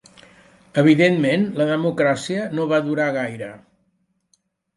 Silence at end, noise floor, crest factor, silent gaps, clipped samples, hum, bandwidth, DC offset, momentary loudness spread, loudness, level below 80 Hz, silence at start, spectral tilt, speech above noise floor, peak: 1.2 s; -68 dBFS; 18 dB; none; under 0.1%; none; 11.5 kHz; under 0.1%; 11 LU; -19 LUFS; -64 dBFS; 0.75 s; -6.5 dB/octave; 49 dB; -2 dBFS